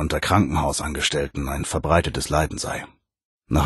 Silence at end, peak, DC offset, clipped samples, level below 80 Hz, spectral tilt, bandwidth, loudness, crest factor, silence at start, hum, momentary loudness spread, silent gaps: 0 s; -2 dBFS; under 0.1%; under 0.1%; -34 dBFS; -4.5 dB/octave; 12.5 kHz; -23 LUFS; 20 dB; 0 s; none; 9 LU; 3.25-3.41 s